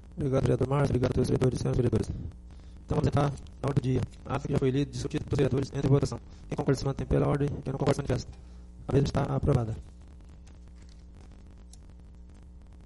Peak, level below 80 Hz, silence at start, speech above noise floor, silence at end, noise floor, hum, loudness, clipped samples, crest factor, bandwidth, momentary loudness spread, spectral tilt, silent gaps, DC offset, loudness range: -12 dBFS; -44 dBFS; 0 s; 21 dB; 0 s; -49 dBFS; none; -29 LUFS; under 0.1%; 18 dB; 11.5 kHz; 15 LU; -7.5 dB/octave; none; under 0.1%; 4 LU